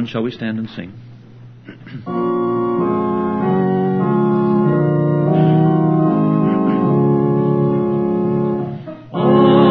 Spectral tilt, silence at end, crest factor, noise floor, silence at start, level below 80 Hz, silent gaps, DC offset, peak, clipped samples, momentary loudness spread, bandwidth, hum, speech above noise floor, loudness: -11 dB/octave; 0 s; 14 dB; -39 dBFS; 0 s; -52 dBFS; none; under 0.1%; 0 dBFS; under 0.1%; 12 LU; 4.9 kHz; none; 18 dB; -16 LUFS